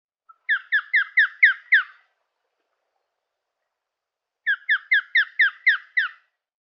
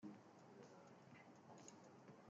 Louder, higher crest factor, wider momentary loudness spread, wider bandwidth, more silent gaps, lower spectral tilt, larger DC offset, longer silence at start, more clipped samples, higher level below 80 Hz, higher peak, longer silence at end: first, -20 LUFS vs -64 LUFS; about the same, 20 dB vs 18 dB; first, 10 LU vs 3 LU; second, 6 kHz vs 7.6 kHz; neither; second, 14 dB/octave vs -5.5 dB/octave; neither; first, 0.5 s vs 0 s; neither; about the same, under -90 dBFS vs under -90 dBFS; first, -4 dBFS vs -44 dBFS; first, 0.55 s vs 0 s